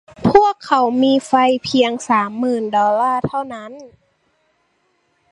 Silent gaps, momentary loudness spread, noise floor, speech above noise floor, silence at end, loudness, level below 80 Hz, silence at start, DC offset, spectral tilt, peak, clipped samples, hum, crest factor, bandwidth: none; 11 LU; -64 dBFS; 47 dB; 1.45 s; -16 LUFS; -50 dBFS; 0.2 s; under 0.1%; -5.5 dB/octave; 0 dBFS; under 0.1%; none; 18 dB; 11 kHz